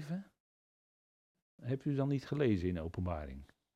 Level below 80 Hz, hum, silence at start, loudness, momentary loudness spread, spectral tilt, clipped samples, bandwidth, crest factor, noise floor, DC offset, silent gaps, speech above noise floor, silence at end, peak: -58 dBFS; none; 0 s; -37 LUFS; 15 LU; -8.5 dB/octave; under 0.1%; 9.2 kHz; 18 dB; under -90 dBFS; under 0.1%; 0.40-1.35 s, 1.42-1.58 s; over 54 dB; 0.3 s; -20 dBFS